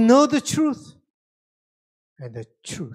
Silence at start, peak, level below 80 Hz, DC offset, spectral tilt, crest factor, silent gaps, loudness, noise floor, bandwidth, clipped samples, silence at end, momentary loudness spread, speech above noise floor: 0 s; -4 dBFS; -64 dBFS; under 0.1%; -5 dB/octave; 18 dB; 1.10-2.16 s; -19 LUFS; under -90 dBFS; 15 kHz; under 0.1%; 0 s; 21 LU; over 70 dB